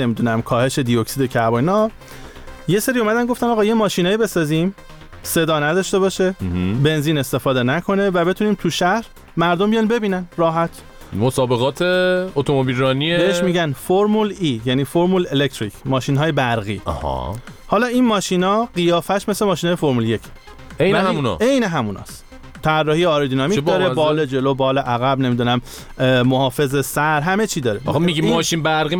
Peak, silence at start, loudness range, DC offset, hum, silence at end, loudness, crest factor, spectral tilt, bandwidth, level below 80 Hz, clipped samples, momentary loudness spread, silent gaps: -2 dBFS; 0 s; 2 LU; under 0.1%; none; 0 s; -18 LUFS; 14 dB; -5.5 dB/octave; 19.5 kHz; -42 dBFS; under 0.1%; 7 LU; none